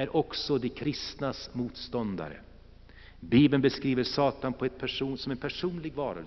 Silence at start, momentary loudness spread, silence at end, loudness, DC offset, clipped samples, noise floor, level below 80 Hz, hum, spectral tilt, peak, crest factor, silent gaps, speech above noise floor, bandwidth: 0 s; 12 LU; 0 s; -30 LUFS; under 0.1%; under 0.1%; -52 dBFS; -54 dBFS; none; -5 dB/octave; -10 dBFS; 20 dB; none; 22 dB; 6.2 kHz